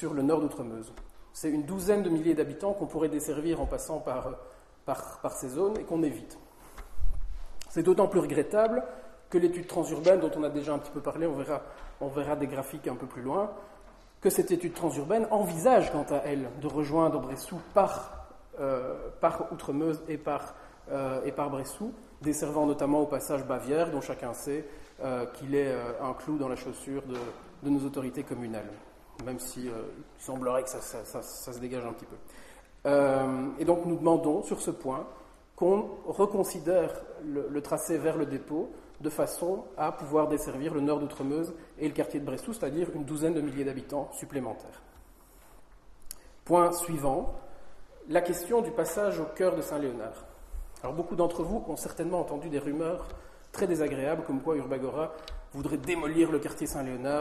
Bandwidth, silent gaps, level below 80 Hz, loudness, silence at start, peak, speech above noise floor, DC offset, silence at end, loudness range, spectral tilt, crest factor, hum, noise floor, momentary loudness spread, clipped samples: 13 kHz; none; -48 dBFS; -31 LUFS; 0 s; -10 dBFS; 26 dB; under 0.1%; 0 s; 6 LU; -6 dB/octave; 22 dB; none; -56 dBFS; 14 LU; under 0.1%